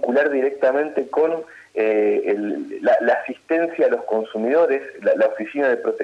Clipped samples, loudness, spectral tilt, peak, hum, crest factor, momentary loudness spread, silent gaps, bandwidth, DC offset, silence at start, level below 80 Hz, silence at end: under 0.1%; -20 LUFS; -6.5 dB/octave; -8 dBFS; none; 12 dB; 5 LU; none; 8.4 kHz; under 0.1%; 0 s; -72 dBFS; 0 s